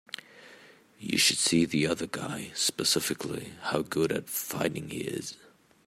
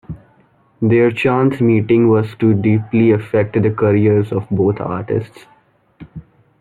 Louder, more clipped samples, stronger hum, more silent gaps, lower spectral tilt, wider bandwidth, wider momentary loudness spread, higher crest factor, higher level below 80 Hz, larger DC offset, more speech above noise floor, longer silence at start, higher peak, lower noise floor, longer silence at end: second, -28 LUFS vs -15 LUFS; neither; neither; neither; second, -3 dB/octave vs -10 dB/octave; first, 16 kHz vs 4.6 kHz; first, 13 LU vs 9 LU; first, 20 dB vs 14 dB; second, -66 dBFS vs -50 dBFS; neither; second, 26 dB vs 39 dB; first, 0.35 s vs 0.1 s; second, -10 dBFS vs -2 dBFS; about the same, -55 dBFS vs -53 dBFS; about the same, 0.5 s vs 0.4 s